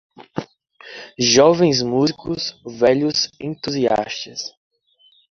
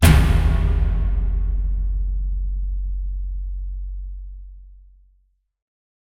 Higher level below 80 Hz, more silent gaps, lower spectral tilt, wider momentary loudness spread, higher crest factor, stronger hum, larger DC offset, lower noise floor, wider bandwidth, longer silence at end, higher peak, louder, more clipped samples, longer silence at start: second, -56 dBFS vs -22 dBFS; neither; second, -4 dB/octave vs -6 dB/octave; about the same, 19 LU vs 17 LU; about the same, 18 dB vs 18 dB; neither; neither; second, -57 dBFS vs -62 dBFS; second, 7.6 kHz vs 16.5 kHz; second, 0.9 s vs 1.25 s; about the same, -2 dBFS vs -2 dBFS; first, -18 LUFS vs -23 LUFS; neither; first, 0.2 s vs 0 s